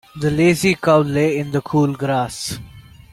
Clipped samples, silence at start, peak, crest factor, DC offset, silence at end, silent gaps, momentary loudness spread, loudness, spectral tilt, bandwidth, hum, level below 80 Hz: under 0.1%; 0.15 s; -2 dBFS; 16 dB; under 0.1%; 0.3 s; none; 11 LU; -18 LUFS; -6 dB/octave; 16 kHz; none; -46 dBFS